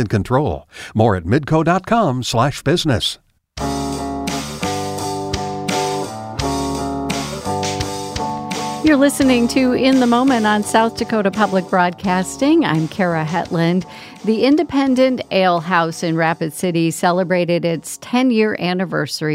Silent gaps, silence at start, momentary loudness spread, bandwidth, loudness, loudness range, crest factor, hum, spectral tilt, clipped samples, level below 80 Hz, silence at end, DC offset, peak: none; 0 s; 9 LU; 16 kHz; -17 LUFS; 7 LU; 16 dB; none; -5.5 dB/octave; under 0.1%; -42 dBFS; 0 s; under 0.1%; 0 dBFS